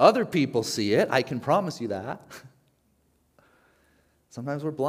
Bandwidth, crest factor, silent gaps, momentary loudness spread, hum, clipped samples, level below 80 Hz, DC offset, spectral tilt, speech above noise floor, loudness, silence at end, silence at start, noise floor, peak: 16 kHz; 24 dB; none; 18 LU; none; under 0.1%; -70 dBFS; under 0.1%; -5.5 dB/octave; 43 dB; -26 LUFS; 0 s; 0 s; -67 dBFS; -2 dBFS